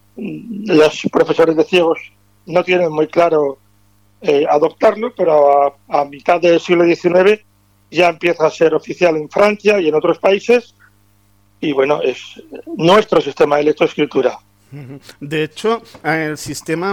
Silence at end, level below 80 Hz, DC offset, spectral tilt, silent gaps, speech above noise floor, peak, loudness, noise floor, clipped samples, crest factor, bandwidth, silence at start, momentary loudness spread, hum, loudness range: 0 s; -56 dBFS; under 0.1%; -5.5 dB/octave; none; 40 dB; -2 dBFS; -14 LUFS; -54 dBFS; under 0.1%; 14 dB; 14 kHz; 0.15 s; 11 LU; 50 Hz at -55 dBFS; 3 LU